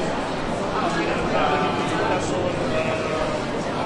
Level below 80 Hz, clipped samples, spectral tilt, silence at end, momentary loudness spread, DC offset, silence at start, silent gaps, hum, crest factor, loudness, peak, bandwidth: -42 dBFS; under 0.1%; -5 dB/octave; 0 s; 5 LU; under 0.1%; 0 s; none; none; 14 dB; -23 LUFS; -8 dBFS; 11.5 kHz